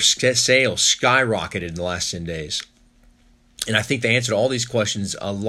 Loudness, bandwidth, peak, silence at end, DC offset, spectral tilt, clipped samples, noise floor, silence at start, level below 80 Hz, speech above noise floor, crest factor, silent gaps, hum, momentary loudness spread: -20 LUFS; 13.5 kHz; -2 dBFS; 0 s; under 0.1%; -2.5 dB/octave; under 0.1%; -55 dBFS; 0 s; -52 dBFS; 34 dB; 18 dB; none; none; 12 LU